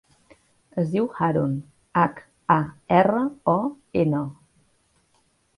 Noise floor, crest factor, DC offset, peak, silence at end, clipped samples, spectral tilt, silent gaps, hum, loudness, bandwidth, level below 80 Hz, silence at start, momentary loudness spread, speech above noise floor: -65 dBFS; 20 dB; under 0.1%; -4 dBFS; 1.25 s; under 0.1%; -9 dB/octave; none; none; -23 LUFS; 11 kHz; -58 dBFS; 0.75 s; 10 LU; 43 dB